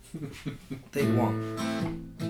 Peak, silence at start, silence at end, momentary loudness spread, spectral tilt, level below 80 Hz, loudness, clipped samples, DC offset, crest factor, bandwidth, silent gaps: -12 dBFS; 0.05 s; 0 s; 14 LU; -6.5 dB/octave; -52 dBFS; -31 LUFS; under 0.1%; under 0.1%; 18 dB; 17 kHz; none